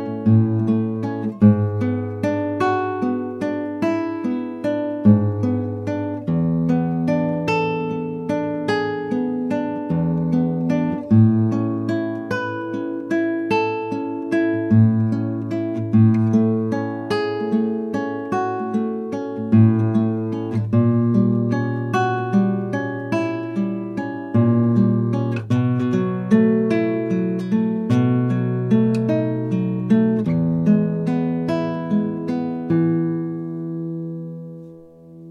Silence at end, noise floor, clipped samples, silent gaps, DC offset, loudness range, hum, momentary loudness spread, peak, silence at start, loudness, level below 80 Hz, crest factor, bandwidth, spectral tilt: 0 s; -42 dBFS; under 0.1%; none; under 0.1%; 3 LU; none; 9 LU; -2 dBFS; 0 s; -20 LUFS; -56 dBFS; 18 dB; 7.2 kHz; -9 dB/octave